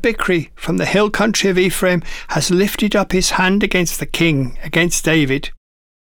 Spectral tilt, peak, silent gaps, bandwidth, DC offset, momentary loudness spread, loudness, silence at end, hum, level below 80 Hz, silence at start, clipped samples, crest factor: -4 dB/octave; -4 dBFS; none; over 20 kHz; under 0.1%; 6 LU; -16 LUFS; 0.5 s; none; -32 dBFS; 0 s; under 0.1%; 12 dB